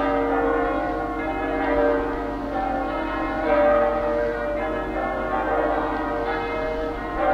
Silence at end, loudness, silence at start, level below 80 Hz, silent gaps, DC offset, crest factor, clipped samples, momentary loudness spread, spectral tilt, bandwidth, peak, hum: 0 s; -24 LUFS; 0 s; -38 dBFS; none; under 0.1%; 14 dB; under 0.1%; 6 LU; -7 dB/octave; 8.8 kHz; -8 dBFS; 50 Hz at -40 dBFS